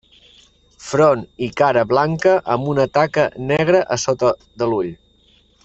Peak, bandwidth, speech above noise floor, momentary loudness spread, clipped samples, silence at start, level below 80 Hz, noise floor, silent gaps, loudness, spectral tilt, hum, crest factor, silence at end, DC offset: -2 dBFS; 8.2 kHz; 38 dB; 8 LU; under 0.1%; 0.8 s; -52 dBFS; -55 dBFS; none; -18 LUFS; -5.5 dB/octave; none; 16 dB; 0.7 s; under 0.1%